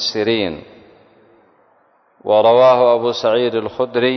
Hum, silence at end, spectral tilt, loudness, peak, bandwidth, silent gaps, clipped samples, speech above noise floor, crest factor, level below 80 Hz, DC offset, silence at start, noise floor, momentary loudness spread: none; 0 s; -5 dB/octave; -15 LUFS; -2 dBFS; 6.4 kHz; none; under 0.1%; 42 dB; 14 dB; -56 dBFS; under 0.1%; 0 s; -56 dBFS; 12 LU